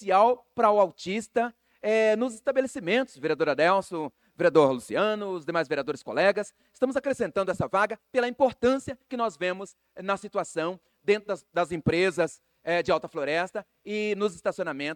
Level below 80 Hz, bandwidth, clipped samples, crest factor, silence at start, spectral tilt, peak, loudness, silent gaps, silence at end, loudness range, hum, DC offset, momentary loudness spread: -62 dBFS; 17 kHz; under 0.1%; 20 dB; 0 s; -5 dB/octave; -8 dBFS; -27 LUFS; none; 0 s; 3 LU; none; under 0.1%; 11 LU